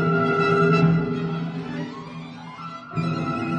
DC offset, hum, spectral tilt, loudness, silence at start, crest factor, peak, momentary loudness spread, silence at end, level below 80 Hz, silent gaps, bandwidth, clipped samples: under 0.1%; none; -8 dB/octave; -22 LUFS; 0 s; 16 dB; -6 dBFS; 18 LU; 0 s; -54 dBFS; none; 7.6 kHz; under 0.1%